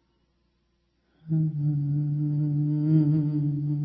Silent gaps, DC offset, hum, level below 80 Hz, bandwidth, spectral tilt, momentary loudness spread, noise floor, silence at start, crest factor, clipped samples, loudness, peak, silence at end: none; under 0.1%; 60 Hz at -65 dBFS; -62 dBFS; 1.6 kHz; -14 dB/octave; 5 LU; -71 dBFS; 1.25 s; 16 dB; under 0.1%; -26 LUFS; -10 dBFS; 0 s